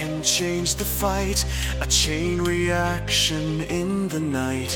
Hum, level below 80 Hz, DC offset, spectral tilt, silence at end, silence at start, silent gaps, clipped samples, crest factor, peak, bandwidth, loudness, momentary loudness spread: none; -32 dBFS; under 0.1%; -3.5 dB/octave; 0 s; 0 s; none; under 0.1%; 18 dB; -6 dBFS; 18 kHz; -22 LUFS; 6 LU